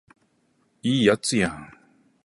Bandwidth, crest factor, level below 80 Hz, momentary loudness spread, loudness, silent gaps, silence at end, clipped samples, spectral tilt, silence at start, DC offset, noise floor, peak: 11.5 kHz; 22 dB; -56 dBFS; 10 LU; -23 LUFS; none; 0.6 s; under 0.1%; -4.5 dB/octave; 0.85 s; under 0.1%; -67 dBFS; -4 dBFS